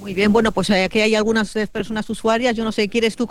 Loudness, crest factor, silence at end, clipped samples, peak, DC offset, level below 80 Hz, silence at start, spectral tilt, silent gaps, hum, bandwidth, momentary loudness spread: -19 LUFS; 14 dB; 0.05 s; under 0.1%; -4 dBFS; 1%; -44 dBFS; 0 s; -4.5 dB/octave; none; none; 12.5 kHz; 8 LU